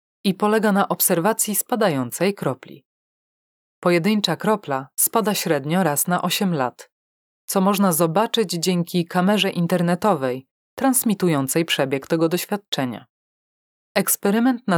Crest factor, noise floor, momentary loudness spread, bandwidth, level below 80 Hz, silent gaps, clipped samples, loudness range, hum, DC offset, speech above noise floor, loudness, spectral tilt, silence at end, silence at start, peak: 20 dB; under -90 dBFS; 7 LU; 20 kHz; -72 dBFS; 2.85-3.82 s, 6.92-7.48 s, 10.51-10.77 s, 12.68-12.72 s, 13.09-13.95 s; under 0.1%; 2 LU; none; under 0.1%; over 70 dB; -20 LUFS; -4.5 dB/octave; 0 s; 0.25 s; -2 dBFS